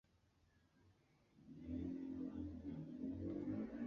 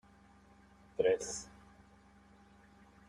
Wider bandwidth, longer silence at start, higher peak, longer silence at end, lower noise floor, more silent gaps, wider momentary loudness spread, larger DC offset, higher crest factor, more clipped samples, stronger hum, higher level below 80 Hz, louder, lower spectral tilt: second, 6.8 kHz vs 11 kHz; second, 0.85 s vs 1 s; second, -36 dBFS vs -18 dBFS; second, 0 s vs 1.6 s; first, -77 dBFS vs -63 dBFS; neither; second, 10 LU vs 23 LU; neither; second, 14 dB vs 22 dB; neither; neither; about the same, -64 dBFS vs -68 dBFS; second, -49 LUFS vs -36 LUFS; first, -9.5 dB/octave vs -3 dB/octave